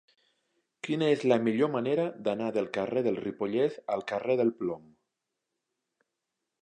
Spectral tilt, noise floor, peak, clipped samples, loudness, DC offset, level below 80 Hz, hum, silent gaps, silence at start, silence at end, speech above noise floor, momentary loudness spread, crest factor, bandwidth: -7 dB/octave; -85 dBFS; -10 dBFS; under 0.1%; -29 LUFS; under 0.1%; -74 dBFS; none; none; 0.85 s; 1.85 s; 57 dB; 9 LU; 22 dB; 9.6 kHz